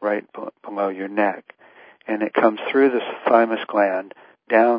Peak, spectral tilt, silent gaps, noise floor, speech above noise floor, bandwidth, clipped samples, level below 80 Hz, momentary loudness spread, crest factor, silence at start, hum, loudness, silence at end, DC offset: -2 dBFS; -10 dB/octave; none; -49 dBFS; 30 dB; 5.2 kHz; under 0.1%; -80 dBFS; 17 LU; 20 dB; 0 s; none; -21 LUFS; 0 s; under 0.1%